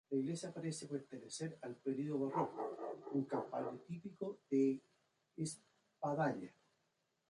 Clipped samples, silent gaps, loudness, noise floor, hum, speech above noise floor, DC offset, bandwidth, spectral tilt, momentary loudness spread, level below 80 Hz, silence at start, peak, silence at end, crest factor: under 0.1%; none; -42 LUFS; -84 dBFS; none; 42 dB; under 0.1%; 11 kHz; -6 dB/octave; 11 LU; -86 dBFS; 0.1 s; -24 dBFS; 0.8 s; 18 dB